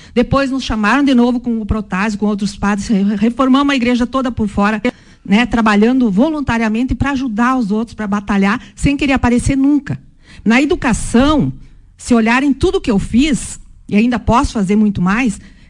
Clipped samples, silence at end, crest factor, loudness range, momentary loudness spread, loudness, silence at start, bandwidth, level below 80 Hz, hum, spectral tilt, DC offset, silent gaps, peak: under 0.1%; 0.2 s; 12 dB; 1 LU; 7 LU; -14 LUFS; 0.15 s; 11 kHz; -30 dBFS; none; -5.5 dB/octave; under 0.1%; none; -2 dBFS